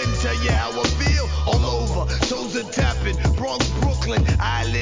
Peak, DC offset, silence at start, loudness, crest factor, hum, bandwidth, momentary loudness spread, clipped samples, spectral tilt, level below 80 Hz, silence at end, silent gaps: -4 dBFS; 0.2%; 0 s; -21 LUFS; 16 dB; none; 7.6 kHz; 3 LU; under 0.1%; -5 dB/octave; -24 dBFS; 0 s; none